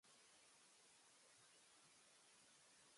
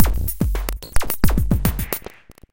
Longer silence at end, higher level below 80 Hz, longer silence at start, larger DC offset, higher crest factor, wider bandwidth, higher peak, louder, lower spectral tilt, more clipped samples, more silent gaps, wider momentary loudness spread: second, 0 s vs 0.55 s; second, under -90 dBFS vs -24 dBFS; about the same, 0.05 s vs 0 s; neither; about the same, 14 dB vs 18 dB; second, 11.5 kHz vs 17.5 kHz; second, -58 dBFS vs 0 dBFS; second, -69 LUFS vs -23 LUFS; second, -0.5 dB/octave vs -5.5 dB/octave; neither; neither; second, 0 LU vs 8 LU